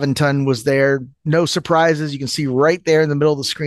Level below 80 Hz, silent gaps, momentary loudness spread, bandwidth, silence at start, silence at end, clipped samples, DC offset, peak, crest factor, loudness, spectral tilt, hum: -54 dBFS; none; 6 LU; 12.5 kHz; 0 s; 0 s; under 0.1%; under 0.1%; -2 dBFS; 14 dB; -17 LUFS; -5.5 dB/octave; none